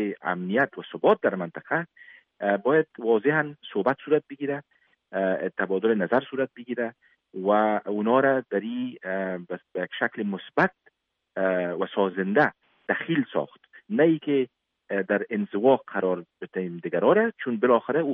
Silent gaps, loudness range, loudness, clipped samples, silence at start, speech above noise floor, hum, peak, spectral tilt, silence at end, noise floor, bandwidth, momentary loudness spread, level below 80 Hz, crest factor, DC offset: none; 3 LU; -26 LUFS; under 0.1%; 0 s; 40 dB; none; -6 dBFS; -4.5 dB/octave; 0 s; -65 dBFS; 5.4 kHz; 10 LU; -76 dBFS; 18 dB; under 0.1%